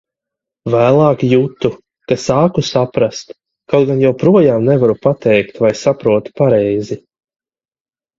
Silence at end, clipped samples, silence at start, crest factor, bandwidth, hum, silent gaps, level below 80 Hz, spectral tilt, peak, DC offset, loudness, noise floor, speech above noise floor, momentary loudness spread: 1.2 s; under 0.1%; 0.65 s; 14 dB; 7.8 kHz; none; none; -50 dBFS; -7 dB/octave; 0 dBFS; under 0.1%; -13 LUFS; under -90 dBFS; over 78 dB; 10 LU